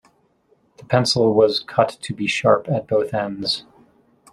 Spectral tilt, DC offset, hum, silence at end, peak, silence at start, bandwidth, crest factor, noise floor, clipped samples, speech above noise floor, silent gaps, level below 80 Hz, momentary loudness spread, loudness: -5 dB/octave; under 0.1%; none; 0.7 s; -2 dBFS; 0.9 s; 13 kHz; 18 dB; -61 dBFS; under 0.1%; 42 dB; none; -58 dBFS; 8 LU; -19 LUFS